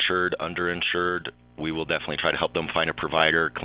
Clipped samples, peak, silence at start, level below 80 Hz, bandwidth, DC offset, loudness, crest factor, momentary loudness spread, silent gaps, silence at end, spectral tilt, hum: under 0.1%; -6 dBFS; 0 s; -52 dBFS; 4 kHz; under 0.1%; -25 LUFS; 20 dB; 10 LU; none; 0 s; -8 dB/octave; none